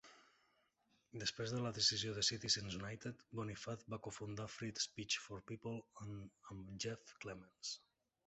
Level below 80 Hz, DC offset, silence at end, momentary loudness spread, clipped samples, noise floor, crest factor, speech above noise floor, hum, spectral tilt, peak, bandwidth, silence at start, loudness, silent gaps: -70 dBFS; under 0.1%; 0.5 s; 17 LU; under 0.1%; -80 dBFS; 24 dB; 35 dB; none; -3 dB/octave; -22 dBFS; 8.2 kHz; 0.05 s; -43 LUFS; none